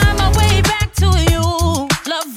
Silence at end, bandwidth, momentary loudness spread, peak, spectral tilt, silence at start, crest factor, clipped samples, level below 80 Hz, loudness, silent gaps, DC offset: 0 s; 16 kHz; 5 LU; -2 dBFS; -4.5 dB/octave; 0 s; 12 dB; under 0.1%; -20 dBFS; -15 LUFS; none; under 0.1%